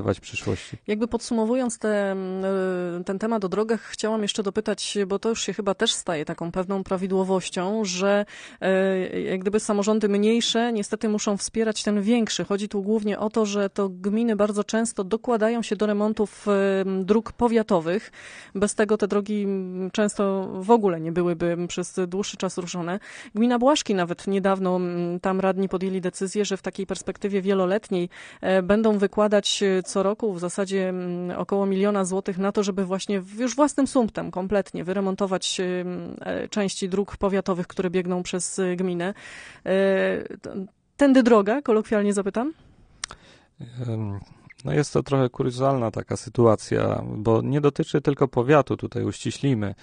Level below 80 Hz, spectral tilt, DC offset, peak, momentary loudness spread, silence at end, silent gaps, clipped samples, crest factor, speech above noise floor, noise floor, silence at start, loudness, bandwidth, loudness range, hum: -54 dBFS; -5 dB/octave; under 0.1%; -4 dBFS; 9 LU; 0.1 s; none; under 0.1%; 18 dB; 25 dB; -48 dBFS; 0 s; -24 LUFS; 10 kHz; 4 LU; none